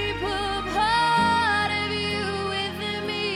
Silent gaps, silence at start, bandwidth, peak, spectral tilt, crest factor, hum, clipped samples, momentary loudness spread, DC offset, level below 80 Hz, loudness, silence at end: none; 0 s; 15.5 kHz; -10 dBFS; -4 dB/octave; 14 dB; none; under 0.1%; 7 LU; under 0.1%; -44 dBFS; -24 LUFS; 0 s